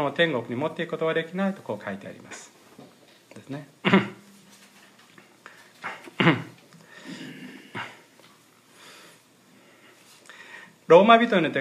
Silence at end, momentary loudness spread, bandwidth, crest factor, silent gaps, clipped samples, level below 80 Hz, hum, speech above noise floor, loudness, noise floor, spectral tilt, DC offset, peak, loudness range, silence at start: 0 s; 26 LU; 14 kHz; 24 dB; none; under 0.1%; -78 dBFS; none; 34 dB; -22 LUFS; -56 dBFS; -6 dB/octave; under 0.1%; -2 dBFS; 19 LU; 0 s